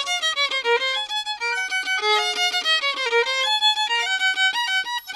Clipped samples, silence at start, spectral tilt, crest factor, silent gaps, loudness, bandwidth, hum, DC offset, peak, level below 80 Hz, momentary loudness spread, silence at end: under 0.1%; 0 s; 3 dB/octave; 14 dB; none; -20 LUFS; 15 kHz; 50 Hz at -70 dBFS; under 0.1%; -8 dBFS; -70 dBFS; 5 LU; 0 s